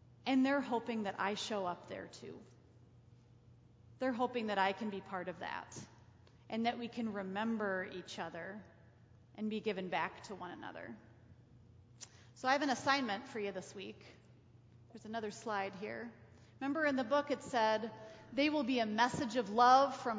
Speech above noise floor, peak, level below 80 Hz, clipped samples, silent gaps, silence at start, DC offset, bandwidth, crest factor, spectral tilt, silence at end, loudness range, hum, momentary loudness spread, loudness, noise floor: 26 dB; -16 dBFS; -72 dBFS; under 0.1%; none; 0.25 s; under 0.1%; 8 kHz; 22 dB; -4.5 dB/octave; 0 s; 8 LU; none; 18 LU; -37 LUFS; -63 dBFS